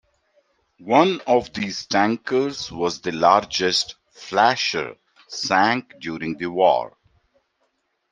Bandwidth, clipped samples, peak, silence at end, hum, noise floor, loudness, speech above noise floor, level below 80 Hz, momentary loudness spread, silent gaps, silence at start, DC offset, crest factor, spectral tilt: 10.5 kHz; under 0.1%; 0 dBFS; 1.25 s; none; -70 dBFS; -21 LUFS; 50 dB; -60 dBFS; 12 LU; none; 0.8 s; under 0.1%; 22 dB; -3.5 dB/octave